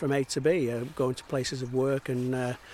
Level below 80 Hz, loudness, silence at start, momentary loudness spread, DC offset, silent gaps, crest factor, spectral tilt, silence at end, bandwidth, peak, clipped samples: -60 dBFS; -29 LUFS; 0 s; 5 LU; under 0.1%; none; 16 dB; -5.5 dB/octave; 0 s; 16 kHz; -14 dBFS; under 0.1%